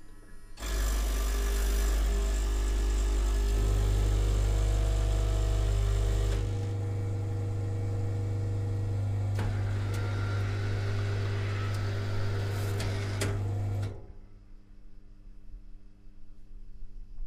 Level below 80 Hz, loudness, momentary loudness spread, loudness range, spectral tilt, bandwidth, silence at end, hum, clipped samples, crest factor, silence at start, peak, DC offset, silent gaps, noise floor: -32 dBFS; -31 LUFS; 4 LU; 6 LU; -5.5 dB/octave; 15.5 kHz; 0 s; none; under 0.1%; 12 dB; 0 s; -16 dBFS; under 0.1%; none; -49 dBFS